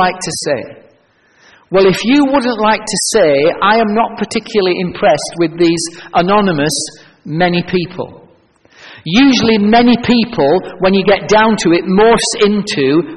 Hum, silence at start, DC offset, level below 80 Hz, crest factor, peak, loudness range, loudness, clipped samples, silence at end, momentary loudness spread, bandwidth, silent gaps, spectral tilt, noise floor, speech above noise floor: none; 0 s; 0.5%; -42 dBFS; 12 dB; 0 dBFS; 4 LU; -12 LUFS; under 0.1%; 0 s; 9 LU; 11 kHz; none; -4.5 dB/octave; -52 dBFS; 40 dB